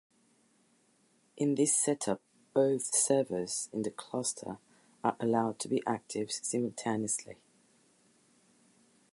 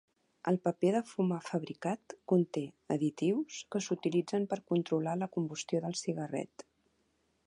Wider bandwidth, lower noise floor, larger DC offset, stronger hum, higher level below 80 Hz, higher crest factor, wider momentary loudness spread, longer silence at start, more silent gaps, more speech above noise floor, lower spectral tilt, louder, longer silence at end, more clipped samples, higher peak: about the same, 11.5 kHz vs 11 kHz; second, -70 dBFS vs -76 dBFS; neither; neither; about the same, -76 dBFS vs -80 dBFS; about the same, 20 dB vs 18 dB; first, 10 LU vs 7 LU; first, 1.35 s vs 0.45 s; neither; second, 38 dB vs 42 dB; second, -4 dB/octave vs -6 dB/octave; about the same, -32 LUFS vs -34 LUFS; first, 1.8 s vs 1 s; neither; about the same, -14 dBFS vs -16 dBFS